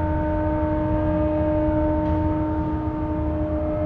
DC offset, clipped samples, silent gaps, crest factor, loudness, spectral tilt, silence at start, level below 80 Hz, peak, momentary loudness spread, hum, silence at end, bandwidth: under 0.1%; under 0.1%; none; 12 dB; -23 LUFS; -11 dB/octave; 0 s; -30 dBFS; -10 dBFS; 4 LU; none; 0 s; 4.4 kHz